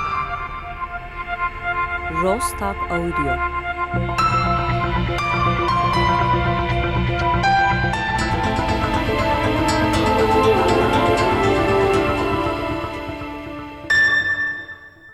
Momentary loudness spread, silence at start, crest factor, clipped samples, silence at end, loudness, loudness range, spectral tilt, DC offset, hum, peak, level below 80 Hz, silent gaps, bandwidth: 13 LU; 0 s; 12 dB; under 0.1%; 0 s; -19 LUFS; 5 LU; -5.5 dB/octave; under 0.1%; none; -8 dBFS; -32 dBFS; none; 15 kHz